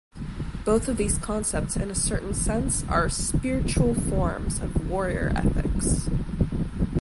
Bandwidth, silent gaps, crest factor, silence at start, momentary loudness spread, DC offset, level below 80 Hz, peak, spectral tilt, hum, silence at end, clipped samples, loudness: 11.5 kHz; none; 16 dB; 0.15 s; 5 LU; under 0.1%; -32 dBFS; -8 dBFS; -5 dB/octave; none; 0 s; under 0.1%; -26 LUFS